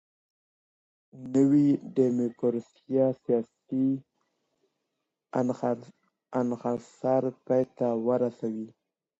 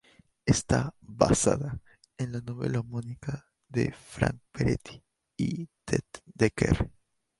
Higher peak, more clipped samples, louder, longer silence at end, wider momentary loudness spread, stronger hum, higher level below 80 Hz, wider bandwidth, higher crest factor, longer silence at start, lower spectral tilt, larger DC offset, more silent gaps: second, -12 dBFS vs -4 dBFS; neither; about the same, -28 LUFS vs -30 LUFS; about the same, 0.5 s vs 0.5 s; about the same, 11 LU vs 13 LU; neither; second, -76 dBFS vs -46 dBFS; second, 8 kHz vs 11.5 kHz; second, 18 dB vs 26 dB; first, 1.15 s vs 0.45 s; first, -9 dB/octave vs -5.5 dB/octave; neither; neither